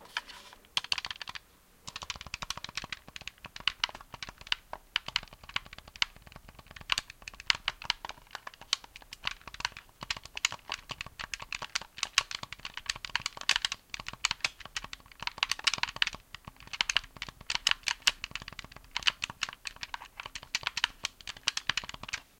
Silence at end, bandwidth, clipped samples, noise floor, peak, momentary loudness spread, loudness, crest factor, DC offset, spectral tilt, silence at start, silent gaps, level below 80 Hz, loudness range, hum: 0.15 s; 17 kHz; under 0.1%; -61 dBFS; -4 dBFS; 16 LU; -34 LUFS; 34 dB; under 0.1%; 0.5 dB/octave; 0 s; none; -58 dBFS; 5 LU; none